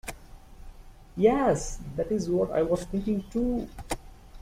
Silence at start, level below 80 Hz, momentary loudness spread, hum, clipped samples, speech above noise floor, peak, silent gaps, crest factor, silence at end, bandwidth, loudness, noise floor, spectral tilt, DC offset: 0.05 s; -44 dBFS; 14 LU; none; under 0.1%; 20 dB; -10 dBFS; none; 20 dB; 0 s; 16 kHz; -28 LUFS; -47 dBFS; -6 dB/octave; under 0.1%